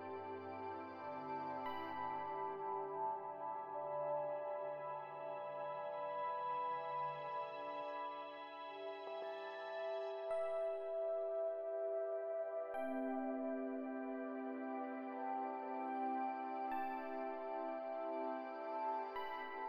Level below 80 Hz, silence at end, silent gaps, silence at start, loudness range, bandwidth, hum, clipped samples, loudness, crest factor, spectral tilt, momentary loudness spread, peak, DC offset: -88 dBFS; 0 s; none; 0 s; 3 LU; 10 kHz; none; under 0.1%; -44 LUFS; 12 dB; -7 dB/octave; 6 LU; -32 dBFS; under 0.1%